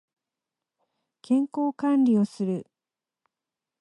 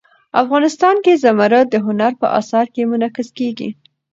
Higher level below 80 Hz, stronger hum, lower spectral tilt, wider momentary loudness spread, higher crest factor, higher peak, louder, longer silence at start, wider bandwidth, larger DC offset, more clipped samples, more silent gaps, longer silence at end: second, -78 dBFS vs -66 dBFS; neither; first, -8 dB/octave vs -5.5 dB/octave; about the same, 9 LU vs 10 LU; about the same, 14 dB vs 14 dB; second, -14 dBFS vs 0 dBFS; second, -25 LUFS vs -15 LUFS; first, 1.3 s vs 0.35 s; first, 11 kHz vs 8 kHz; neither; neither; neither; first, 1.2 s vs 0.4 s